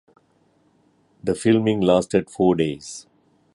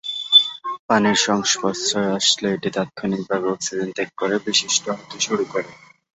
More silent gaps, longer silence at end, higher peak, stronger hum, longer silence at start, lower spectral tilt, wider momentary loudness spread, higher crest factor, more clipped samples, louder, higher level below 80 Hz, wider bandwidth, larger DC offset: second, none vs 0.79-0.89 s; first, 0.55 s vs 0.4 s; about the same, -4 dBFS vs -2 dBFS; neither; first, 1.25 s vs 0.05 s; first, -6 dB/octave vs -2.5 dB/octave; first, 16 LU vs 12 LU; about the same, 18 dB vs 20 dB; neither; about the same, -20 LUFS vs -19 LUFS; first, -54 dBFS vs -64 dBFS; first, 11.5 kHz vs 8.2 kHz; neither